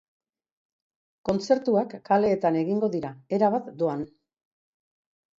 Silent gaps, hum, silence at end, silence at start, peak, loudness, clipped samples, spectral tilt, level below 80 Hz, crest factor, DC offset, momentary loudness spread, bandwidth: none; none; 1.35 s; 1.25 s; -8 dBFS; -25 LUFS; under 0.1%; -7 dB/octave; -64 dBFS; 18 dB; under 0.1%; 10 LU; 7.6 kHz